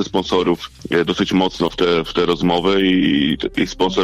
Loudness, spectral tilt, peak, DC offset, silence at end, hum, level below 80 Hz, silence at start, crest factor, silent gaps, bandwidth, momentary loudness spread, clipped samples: -17 LUFS; -5.5 dB/octave; -4 dBFS; under 0.1%; 0 s; none; -40 dBFS; 0 s; 14 dB; none; 14 kHz; 5 LU; under 0.1%